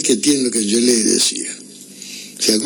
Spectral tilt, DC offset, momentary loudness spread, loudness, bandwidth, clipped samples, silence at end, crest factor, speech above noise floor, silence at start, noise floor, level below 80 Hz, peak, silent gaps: -2 dB/octave; under 0.1%; 19 LU; -15 LUFS; over 20 kHz; under 0.1%; 0 s; 16 dB; 21 dB; 0 s; -37 dBFS; -64 dBFS; -2 dBFS; none